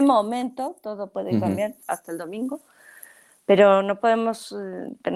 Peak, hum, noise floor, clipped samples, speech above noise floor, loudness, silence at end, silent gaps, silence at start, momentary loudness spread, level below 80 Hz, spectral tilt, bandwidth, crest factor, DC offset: -4 dBFS; none; -50 dBFS; under 0.1%; 27 dB; -23 LUFS; 0 s; none; 0 s; 16 LU; -70 dBFS; -6 dB/octave; 15 kHz; 20 dB; under 0.1%